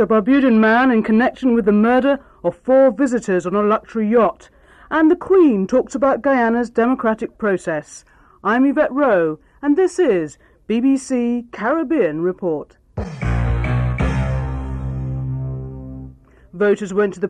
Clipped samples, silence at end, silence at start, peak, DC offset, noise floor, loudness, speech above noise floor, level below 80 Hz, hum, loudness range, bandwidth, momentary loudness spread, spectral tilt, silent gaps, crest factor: under 0.1%; 0 s; 0 s; -6 dBFS; under 0.1%; -42 dBFS; -17 LUFS; 25 dB; -34 dBFS; none; 7 LU; 10.5 kHz; 12 LU; -7.5 dB/octave; none; 12 dB